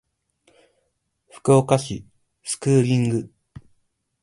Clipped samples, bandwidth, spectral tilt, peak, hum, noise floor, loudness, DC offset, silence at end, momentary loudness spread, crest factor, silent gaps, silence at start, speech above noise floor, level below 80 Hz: under 0.1%; 11.5 kHz; -6.5 dB/octave; -2 dBFS; none; -72 dBFS; -21 LUFS; under 0.1%; 0.95 s; 18 LU; 22 dB; none; 1.35 s; 53 dB; -56 dBFS